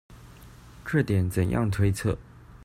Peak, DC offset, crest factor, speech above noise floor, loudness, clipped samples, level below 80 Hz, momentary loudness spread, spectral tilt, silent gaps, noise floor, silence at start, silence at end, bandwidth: -10 dBFS; under 0.1%; 18 dB; 24 dB; -26 LUFS; under 0.1%; -46 dBFS; 8 LU; -7 dB/octave; none; -48 dBFS; 0.1 s; 0 s; 15 kHz